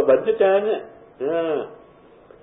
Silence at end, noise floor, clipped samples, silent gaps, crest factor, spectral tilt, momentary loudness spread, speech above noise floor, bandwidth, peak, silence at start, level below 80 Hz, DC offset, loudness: 0.7 s; -49 dBFS; under 0.1%; none; 16 dB; -10 dB/octave; 11 LU; 29 dB; 3.9 kHz; -6 dBFS; 0 s; -62 dBFS; under 0.1%; -21 LUFS